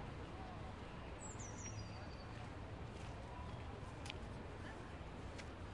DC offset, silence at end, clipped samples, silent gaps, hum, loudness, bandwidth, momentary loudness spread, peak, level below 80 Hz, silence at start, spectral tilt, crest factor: under 0.1%; 0 s; under 0.1%; none; none; -51 LUFS; 11 kHz; 2 LU; -28 dBFS; -58 dBFS; 0 s; -5 dB/octave; 22 dB